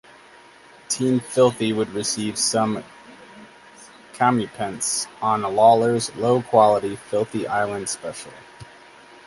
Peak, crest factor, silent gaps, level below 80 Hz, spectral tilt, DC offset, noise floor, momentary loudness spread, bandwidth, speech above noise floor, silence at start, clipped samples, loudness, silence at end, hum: -2 dBFS; 20 dB; none; -62 dBFS; -4 dB/octave; under 0.1%; -48 dBFS; 12 LU; 11.5 kHz; 28 dB; 0.9 s; under 0.1%; -21 LUFS; 0.65 s; none